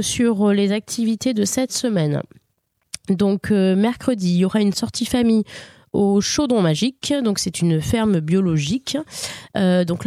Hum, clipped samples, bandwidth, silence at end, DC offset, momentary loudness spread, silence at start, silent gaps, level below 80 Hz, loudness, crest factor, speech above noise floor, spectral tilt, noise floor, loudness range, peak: none; under 0.1%; 15 kHz; 0 s; under 0.1%; 9 LU; 0 s; none; -48 dBFS; -19 LUFS; 14 dB; 51 dB; -5.5 dB/octave; -70 dBFS; 2 LU; -4 dBFS